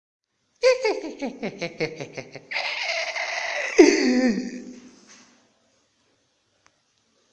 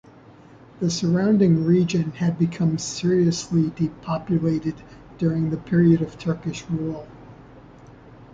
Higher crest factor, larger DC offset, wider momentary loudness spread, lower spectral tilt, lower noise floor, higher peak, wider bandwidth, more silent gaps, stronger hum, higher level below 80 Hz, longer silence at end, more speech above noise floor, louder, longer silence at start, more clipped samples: first, 24 dB vs 16 dB; neither; first, 20 LU vs 11 LU; second, -3.5 dB/octave vs -7 dB/octave; first, -68 dBFS vs -47 dBFS; first, 0 dBFS vs -6 dBFS; first, 9.4 kHz vs 7.8 kHz; neither; neither; second, -64 dBFS vs -52 dBFS; first, 2.45 s vs 0.1 s; first, 40 dB vs 26 dB; about the same, -23 LUFS vs -22 LUFS; second, 0.6 s vs 0.8 s; neither